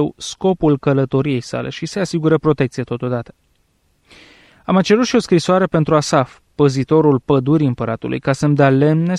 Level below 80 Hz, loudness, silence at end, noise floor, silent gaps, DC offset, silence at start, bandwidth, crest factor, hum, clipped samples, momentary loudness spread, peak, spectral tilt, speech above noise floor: -48 dBFS; -16 LUFS; 0 s; -61 dBFS; none; under 0.1%; 0 s; 11 kHz; 14 dB; none; under 0.1%; 9 LU; -2 dBFS; -6.5 dB/octave; 45 dB